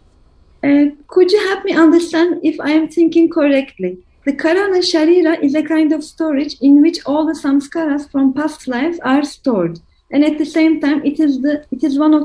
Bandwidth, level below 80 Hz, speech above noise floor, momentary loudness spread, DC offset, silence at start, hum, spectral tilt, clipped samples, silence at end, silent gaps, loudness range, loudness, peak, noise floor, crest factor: 11 kHz; -52 dBFS; 35 dB; 8 LU; under 0.1%; 0.65 s; none; -5 dB/octave; under 0.1%; 0 s; none; 3 LU; -14 LUFS; 0 dBFS; -49 dBFS; 14 dB